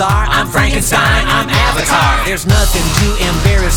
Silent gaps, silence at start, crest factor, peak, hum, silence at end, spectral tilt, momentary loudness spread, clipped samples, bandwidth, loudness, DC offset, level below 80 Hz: none; 0 s; 12 dB; 0 dBFS; none; 0 s; -4 dB/octave; 2 LU; under 0.1%; over 20 kHz; -12 LUFS; under 0.1%; -16 dBFS